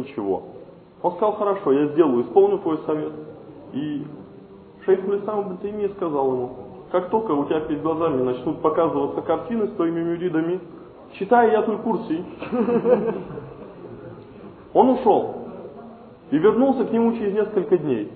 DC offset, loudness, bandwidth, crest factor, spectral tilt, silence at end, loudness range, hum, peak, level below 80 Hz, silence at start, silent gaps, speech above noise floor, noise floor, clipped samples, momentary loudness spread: under 0.1%; -22 LUFS; 4.5 kHz; 20 dB; -11.5 dB/octave; 0 s; 4 LU; none; -2 dBFS; -58 dBFS; 0 s; none; 23 dB; -44 dBFS; under 0.1%; 21 LU